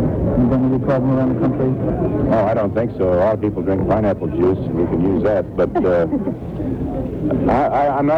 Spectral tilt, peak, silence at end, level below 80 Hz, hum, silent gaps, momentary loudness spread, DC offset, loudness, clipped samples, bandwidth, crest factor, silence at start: -10.5 dB/octave; -4 dBFS; 0 s; -34 dBFS; none; none; 6 LU; under 0.1%; -18 LUFS; under 0.1%; 6 kHz; 12 dB; 0 s